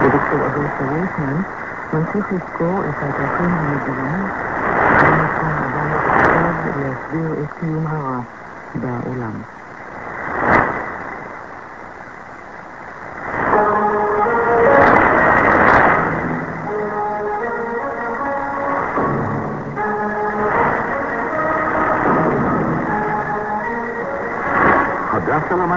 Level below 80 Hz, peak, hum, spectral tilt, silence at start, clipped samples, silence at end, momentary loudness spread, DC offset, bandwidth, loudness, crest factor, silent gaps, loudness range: -42 dBFS; 0 dBFS; none; -8.5 dB/octave; 0 s; under 0.1%; 0 s; 17 LU; 0.3%; 7.6 kHz; -17 LUFS; 18 dB; none; 9 LU